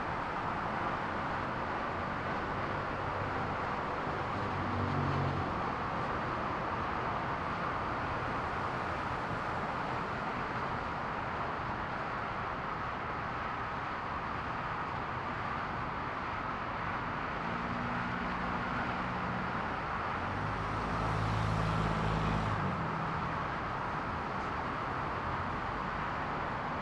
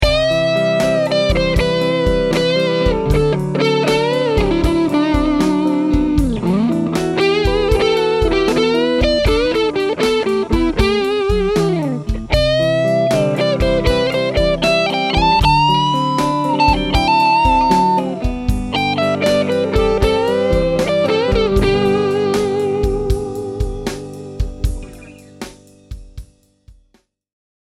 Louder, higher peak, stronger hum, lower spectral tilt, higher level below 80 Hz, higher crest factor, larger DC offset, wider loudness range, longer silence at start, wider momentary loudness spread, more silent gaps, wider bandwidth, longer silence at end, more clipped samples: second, -35 LUFS vs -15 LUFS; second, -20 dBFS vs 0 dBFS; neither; about the same, -6.5 dB/octave vs -6 dB/octave; second, -50 dBFS vs -26 dBFS; about the same, 16 dB vs 16 dB; neither; second, 3 LU vs 6 LU; about the same, 0 s vs 0 s; second, 4 LU vs 8 LU; neither; second, 12 kHz vs 14.5 kHz; second, 0 s vs 1.05 s; neither